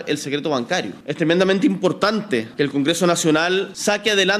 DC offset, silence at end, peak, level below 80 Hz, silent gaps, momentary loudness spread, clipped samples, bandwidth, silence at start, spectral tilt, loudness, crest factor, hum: under 0.1%; 0 s; -4 dBFS; -62 dBFS; none; 7 LU; under 0.1%; 15 kHz; 0 s; -4 dB/octave; -19 LUFS; 16 dB; none